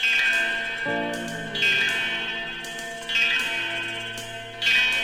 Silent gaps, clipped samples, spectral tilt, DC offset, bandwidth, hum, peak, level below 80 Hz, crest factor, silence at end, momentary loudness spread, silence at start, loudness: none; under 0.1%; -1.5 dB/octave; under 0.1%; 16.5 kHz; none; -10 dBFS; -54 dBFS; 16 dB; 0 s; 13 LU; 0 s; -23 LUFS